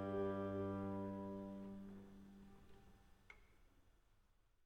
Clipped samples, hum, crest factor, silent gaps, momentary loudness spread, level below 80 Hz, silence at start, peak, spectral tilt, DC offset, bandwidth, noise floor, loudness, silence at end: under 0.1%; none; 18 dB; none; 22 LU; -70 dBFS; 0 s; -32 dBFS; -9 dB/octave; under 0.1%; 9.6 kHz; -75 dBFS; -47 LUFS; 0.45 s